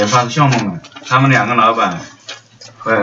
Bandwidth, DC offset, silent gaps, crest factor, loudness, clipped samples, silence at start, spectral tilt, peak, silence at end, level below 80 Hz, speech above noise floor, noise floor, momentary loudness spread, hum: 7.8 kHz; under 0.1%; none; 14 dB; -13 LUFS; under 0.1%; 0 s; -5 dB/octave; 0 dBFS; 0 s; -56 dBFS; 24 dB; -38 dBFS; 20 LU; none